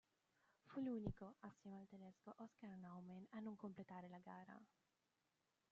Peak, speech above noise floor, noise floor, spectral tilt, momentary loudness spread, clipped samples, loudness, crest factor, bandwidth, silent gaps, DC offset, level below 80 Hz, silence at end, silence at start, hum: -32 dBFS; 34 dB; -89 dBFS; -8 dB/octave; 13 LU; under 0.1%; -56 LUFS; 24 dB; 7.4 kHz; none; under 0.1%; -72 dBFS; 1.05 s; 0.65 s; none